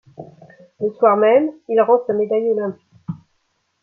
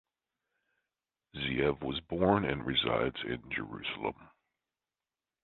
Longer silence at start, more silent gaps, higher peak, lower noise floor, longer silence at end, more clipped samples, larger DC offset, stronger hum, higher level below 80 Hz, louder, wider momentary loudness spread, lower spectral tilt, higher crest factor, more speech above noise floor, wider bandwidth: second, 0.2 s vs 1.35 s; neither; first, -2 dBFS vs -10 dBFS; second, -68 dBFS vs under -90 dBFS; second, 0.65 s vs 1.15 s; neither; neither; neither; second, -66 dBFS vs -56 dBFS; first, -17 LUFS vs -33 LUFS; first, 19 LU vs 10 LU; about the same, -9 dB/octave vs -9 dB/octave; second, 16 dB vs 24 dB; second, 51 dB vs over 57 dB; second, 3.1 kHz vs 4.4 kHz